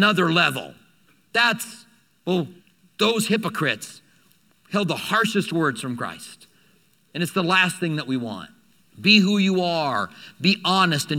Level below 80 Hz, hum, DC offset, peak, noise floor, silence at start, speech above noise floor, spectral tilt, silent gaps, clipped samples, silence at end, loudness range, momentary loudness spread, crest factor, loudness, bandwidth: -70 dBFS; none; under 0.1%; 0 dBFS; -61 dBFS; 0 s; 39 dB; -4.5 dB/octave; none; under 0.1%; 0 s; 5 LU; 16 LU; 22 dB; -21 LUFS; 16.5 kHz